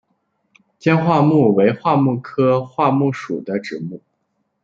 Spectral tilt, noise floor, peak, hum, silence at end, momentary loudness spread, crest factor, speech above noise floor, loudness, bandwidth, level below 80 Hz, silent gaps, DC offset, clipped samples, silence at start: -8.5 dB/octave; -70 dBFS; -2 dBFS; none; 0.65 s; 12 LU; 16 dB; 54 dB; -17 LUFS; 7.6 kHz; -62 dBFS; none; under 0.1%; under 0.1%; 0.85 s